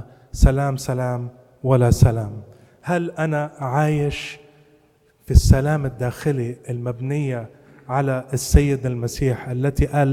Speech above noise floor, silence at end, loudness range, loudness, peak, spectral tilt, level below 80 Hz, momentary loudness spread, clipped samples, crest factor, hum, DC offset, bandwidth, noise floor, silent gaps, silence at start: 38 dB; 0 s; 2 LU; -21 LUFS; 0 dBFS; -6.5 dB/octave; -26 dBFS; 13 LU; under 0.1%; 20 dB; none; under 0.1%; 15.5 kHz; -58 dBFS; none; 0 s